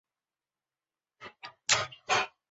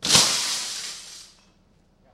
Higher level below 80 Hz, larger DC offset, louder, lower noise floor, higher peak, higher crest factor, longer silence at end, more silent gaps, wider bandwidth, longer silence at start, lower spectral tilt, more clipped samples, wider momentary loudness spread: second, -68 dBFS vs -56 dBFS; neither; second, -29 LUFS vs -21 LUFS; first, under -90 dBFS vs -60 dBFS; second, -8 dBFS vs -2 dBFS; about the same, 26 dB vs 24 dB; second, 0.25 s vs 0.9 s; neither; second, 8 kHz vs 16 kHz; first, 1.2 s vs 0 s; about the same, 1 dB/octave vs 0 dB/octave; neither; about the same, 22 LU vs 24 LU